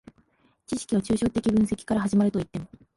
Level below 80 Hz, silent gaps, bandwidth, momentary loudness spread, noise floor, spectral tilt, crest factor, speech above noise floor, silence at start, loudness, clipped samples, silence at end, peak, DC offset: -50 dBFS; none; 11.5 kHz; 11 LU; -64 dBFS; -6.5 dB/octave; 14 dB; 39 dB; 0.7 s; -25 LUFS; under 0.1%; 0.3 s; -12 dBFS; under 0.1%